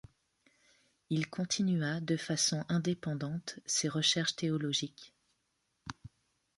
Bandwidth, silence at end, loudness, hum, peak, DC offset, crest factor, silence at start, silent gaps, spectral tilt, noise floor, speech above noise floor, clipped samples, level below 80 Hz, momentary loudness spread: 11.5 kHz; 0.5 s; -33 LUFS; none; -14 dBFS; under 0.1%; 20 dB; 1.1 s; none; -3.5 dB/octave; -80 dBFS; 46 dB; under 0.1%; -70 dBFS; 17 LU